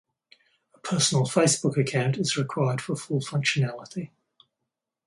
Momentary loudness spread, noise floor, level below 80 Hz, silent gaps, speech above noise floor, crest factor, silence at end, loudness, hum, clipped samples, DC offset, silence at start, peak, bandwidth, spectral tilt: 15 LU; -84 dBFS; -66 dBFS; none; 59 dB; 20 dB; 1 s; -25 LUFS; none; under 0.1%; under 0.1%; 0.85 s; -8 dBFS; 11.5 kHz; -4.5 dB/octave